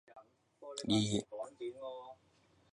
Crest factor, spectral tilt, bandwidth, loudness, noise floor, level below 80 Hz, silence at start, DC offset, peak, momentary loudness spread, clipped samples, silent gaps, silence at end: 20 dB; -5 dB/octave; 11.5 kHz; -38 LUFS; -70 dBFS; -70 dBFS; 0.1 s; under 0.1%; -20 dBFS; 20 LU; under 0.1%; none; 0.6 s